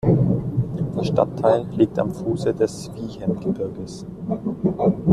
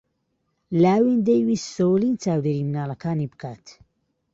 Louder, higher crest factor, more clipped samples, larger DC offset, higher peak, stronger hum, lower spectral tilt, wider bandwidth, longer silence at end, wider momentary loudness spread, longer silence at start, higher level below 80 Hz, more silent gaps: about the same, -23 LUFS vs -22 LUFS; about the same, 18 dB vs 16 dB; neither; neither; first, -2 dBFS vs -8 dBFS; neither; about the same, -8.5 dB/octave vs -7.5 dB/octave; first, 12 kHz vs 7.8 kHz; second, 0 s vs 0.65 s; about the same, 11 LU vs 10 LU; second, 0.05 s vs 0.7 s; first, -46 dBFS vs -62 dBFS; neither